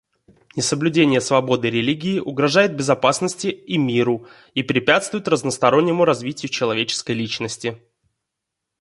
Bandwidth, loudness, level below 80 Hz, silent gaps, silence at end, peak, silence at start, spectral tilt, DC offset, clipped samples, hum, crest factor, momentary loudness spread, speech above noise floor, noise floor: 11.5 kHz; -19 LUFS; -60 dBFS; none; 1.05 s; 0 dBFS; 0.55 s; -4.5 dB/octave; under 0.1%; under 0.1%; none; 20 dB; 9 LU; 62 dB; -81 dBFS